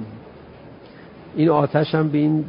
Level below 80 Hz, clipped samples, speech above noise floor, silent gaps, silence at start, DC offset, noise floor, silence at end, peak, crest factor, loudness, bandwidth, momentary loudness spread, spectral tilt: -56 dBFS; under 0.1%; 24 dB; none; 0 s; under 0.1%; -42 dBFS; 0 s; -4 dBFS; 18 dB; -19 LUFS; 5.4 kHz; 18 LU; -12.5 dB/octave